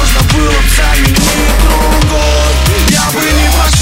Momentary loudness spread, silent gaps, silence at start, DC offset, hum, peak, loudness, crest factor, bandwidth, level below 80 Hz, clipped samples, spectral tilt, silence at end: 1 LU; none; 0 s; under 0.1%; none; 0 dBFS; -9 LUFS; 8 dB; 16.5 kHz; -10 dBFS; 0.2%; -4 dB/octave; 0 s